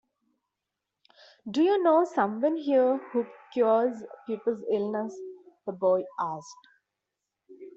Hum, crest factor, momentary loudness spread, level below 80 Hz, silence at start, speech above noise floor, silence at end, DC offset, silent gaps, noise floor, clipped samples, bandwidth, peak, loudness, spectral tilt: none; 18 dB; 17 LU; -78 dBFS; 1.45 s; 59 dB; 0.05 s; under 0.1%; none; -86 dBFS; under 0.1%; 7.8 kHz; -10 dBFS; -27 LUFS; -6.5 dB/octave